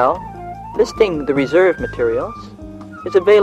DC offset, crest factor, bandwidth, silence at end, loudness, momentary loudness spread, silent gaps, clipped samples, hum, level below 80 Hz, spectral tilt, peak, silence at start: under 0.1%; 14 dB; 9.2 kHz; 0 s; -17 LUFS; 20 LU; none; under 0.1%; none; -40 dBFS; -6 dB/octave; -2 dBFS; 0 s